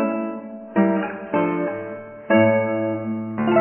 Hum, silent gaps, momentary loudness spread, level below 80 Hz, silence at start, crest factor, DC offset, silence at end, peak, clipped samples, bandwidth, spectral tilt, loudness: none; none; 14 LU; -64 dBFS; 0 s; 16 dB; under 0.1%; 0 s; -4 dBFS; under 0.1%; 3.3 kHz; -11 dB/octave; -22 LUFS